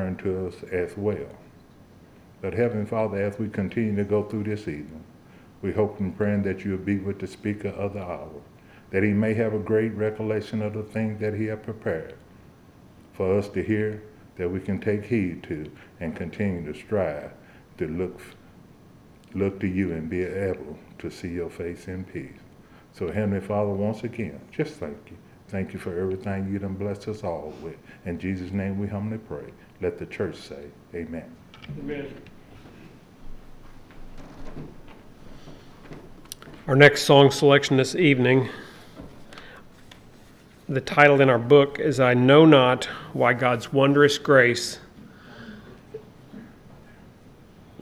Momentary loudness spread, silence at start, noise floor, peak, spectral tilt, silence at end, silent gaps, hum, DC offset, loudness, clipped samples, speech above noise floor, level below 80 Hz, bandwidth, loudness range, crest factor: 25 LU; 0 s; -51 dBFS; 0 dBFS; -6 dB/octave; 0.55 s; none; none; under 0.1%; -24 LUFS; under 0.1%; 27 dB; -52 dBFS; 14 kHz; 14 LU; 24 dB